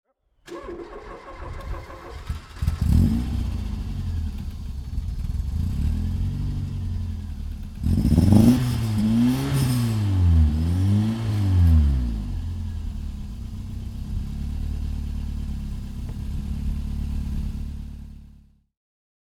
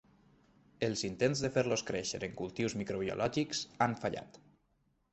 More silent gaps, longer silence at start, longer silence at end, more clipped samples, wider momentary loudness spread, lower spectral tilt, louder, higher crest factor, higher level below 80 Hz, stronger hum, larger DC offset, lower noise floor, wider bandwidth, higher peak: neither; second, 0.45 s vs 0.8 s; first, 1.1 s vs 0.75 s; neither; first, 17 LU vs 7 LU; first, -7.5 dB/octave vs -4.5 dB/octave; first, -25 LUFS vs -35 LUFS; about the same, 22 dB vs 22 dB; first, -28 dBFS vs -64 dBFS; neither; neither; second, -51 dBFS vs -75 dBFS; first, 15 kHz vs 8.4 kHz; first, -2 dBFS vs -14 dBFS